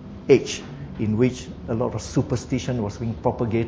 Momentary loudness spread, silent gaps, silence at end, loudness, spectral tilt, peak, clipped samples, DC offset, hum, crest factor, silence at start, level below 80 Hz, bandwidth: 11 LU; none; 0 s; -24 LUFS; -6.5 dB/octave; -2 dBFS; under 0.1%; under 0.1%; none; 22 dB; 0 s; -42 dBFS; 8 kHz